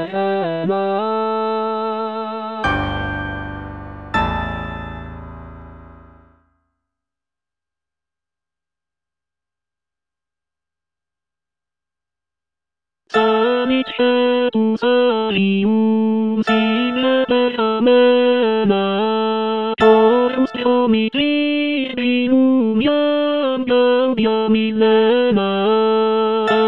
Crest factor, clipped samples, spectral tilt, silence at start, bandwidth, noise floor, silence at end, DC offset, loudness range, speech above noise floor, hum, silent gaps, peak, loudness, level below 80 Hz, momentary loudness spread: 16 dB; under 0.1%; -7.5 dB/octave; 0 s; 7.6 kHz; -90 dBFS; 0 s; under 0.1%; 11 LU; 74 dB; none; none; 0 dBFS; -17 LUFS; -44 dBFS; 10 LU